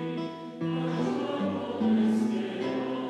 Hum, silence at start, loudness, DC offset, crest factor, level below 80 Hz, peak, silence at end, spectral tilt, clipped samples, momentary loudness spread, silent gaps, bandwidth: none; 0 s; -29 LUFS; under 0.1%; 12 dB; -78 dBFS; -16 dBFS; 0 s; -7.5 dB/octave; under 0.1%; 9 LU; none; 10.5 kHz